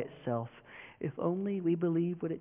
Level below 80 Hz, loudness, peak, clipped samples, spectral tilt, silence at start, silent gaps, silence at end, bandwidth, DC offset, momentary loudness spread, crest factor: -72 dBFS; -34 LUFS; -18 dBFS; under 0.1%; -8.5 dB/octave; 0 s; none; 0 s; 3.6 kHz; under 0.1%; 15 LU; 16 dB